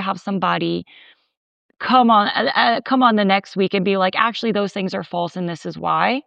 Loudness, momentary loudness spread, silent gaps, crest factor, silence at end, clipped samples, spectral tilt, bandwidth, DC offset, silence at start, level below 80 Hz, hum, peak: -18 LUFS; 10 LU; 1.37-1.69 s; 16 dB; 0.05 s; under 0.1%; -6 dB/octave; 8.6 kHz; under 0.1%; 0 s; -70 dBFS; none; -2 dBFS